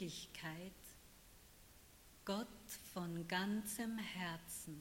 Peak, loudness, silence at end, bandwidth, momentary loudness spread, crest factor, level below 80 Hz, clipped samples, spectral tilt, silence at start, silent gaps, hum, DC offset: -26 dBFS; -46 LUFS; 0 s; 16.5 kHz; 21 LU; 22 dB; -70 dBFS; under 0.1%; -4 dB/octave; 0 s; none; none; under 0.1%